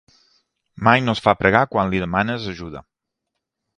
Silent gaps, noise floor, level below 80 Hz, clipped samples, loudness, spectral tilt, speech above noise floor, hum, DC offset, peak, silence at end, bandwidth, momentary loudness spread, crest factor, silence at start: none; -80 dBFS; -46 dBFS; under 0.1%; -19 LUFS; -6.5 dB/octave; 61 dB; none; under 0.1%; 0 dBFS; 1 s; 10 kHz; 16 LU; 22 dB; 0.8 s